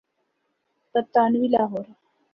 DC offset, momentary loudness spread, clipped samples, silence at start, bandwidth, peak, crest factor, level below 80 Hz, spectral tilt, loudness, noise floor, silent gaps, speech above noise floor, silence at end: under 0.1%; 13 LU; under 0.1%; 0.95 s; 5.6 kHz; -6 dBFS; 20 dB; -70 dBFS; -9 dB/octave; -22 LUFS; -74 dBFS; none; 52 dB; 0.5 s